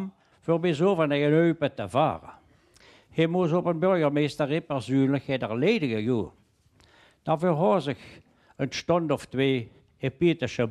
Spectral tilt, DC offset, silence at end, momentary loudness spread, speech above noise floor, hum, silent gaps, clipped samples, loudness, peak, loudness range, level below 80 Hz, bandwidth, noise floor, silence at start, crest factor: -7 dB/octave; under 0.1%; 0 s; 11 LU; 36 dB; none; none; under 0.1%; -26 LUFS; -10 dBFS; 3 LU; -62 dBFS; 12 kHz; -61 dBFS; 0 s; 16 dB